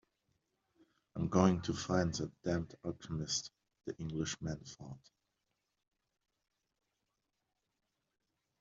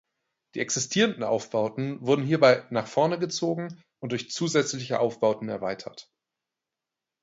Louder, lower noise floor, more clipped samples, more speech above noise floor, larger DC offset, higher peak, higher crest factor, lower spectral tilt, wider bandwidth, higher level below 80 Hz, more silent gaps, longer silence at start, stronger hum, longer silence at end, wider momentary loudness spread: second, -37 LUFS vs -26 LUFS; about the same, -86 dBFS vs -88 dBFS; neither; second, 50 dB vs 62 dB; neither; second, -14 dBFS vs -6 dBFS; about the same, 26 dB vs 22 dB; first, -6 dB/octave vs -4.5 dB/octave; about the same, 7.8 kHz vs 8 kHz; first, -64 dBFS vs -70 dBFS; neither; first, 1.15 s vs 0.55 s; neither; first, 3.65 s vs 1.2 s; first, 20 LU vs 13 LU